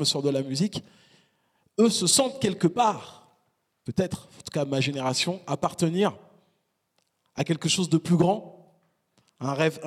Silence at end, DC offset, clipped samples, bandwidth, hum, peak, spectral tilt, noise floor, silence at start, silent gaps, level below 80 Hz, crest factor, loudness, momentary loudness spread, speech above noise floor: 0 s; under 0.1%; under 0.1%; 15 kHz; none; -8 dBFS; -4.5 dB/octave; -74 dBFS; 0 s; none; -64 dBFS; 18 dB; -25 LUFS; 14 LU; 48 dB